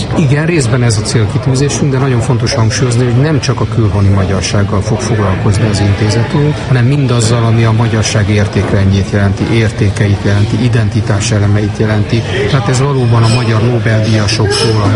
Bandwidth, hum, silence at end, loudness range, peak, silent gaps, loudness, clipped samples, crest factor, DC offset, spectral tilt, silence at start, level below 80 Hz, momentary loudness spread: 11.5 kHz; none; 0 s; 1 LU; 0 dBFS; none; -11 LUFS; under 0.1%; 10 dB; 0.3%; -6 dB/octave; 0 s; -30 dBFS; 3 LU